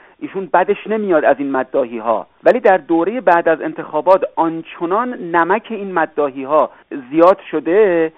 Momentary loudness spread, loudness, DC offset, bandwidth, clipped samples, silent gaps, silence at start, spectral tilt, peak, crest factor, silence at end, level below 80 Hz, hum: 8 LU; -16 LUFS; 0.1%; 4.3 kHz; under 0.1%; none; 0.2 s; -4.5 dB/octave; 0 dBFS; 16 dB; 0.1 s; -62 dBFS; none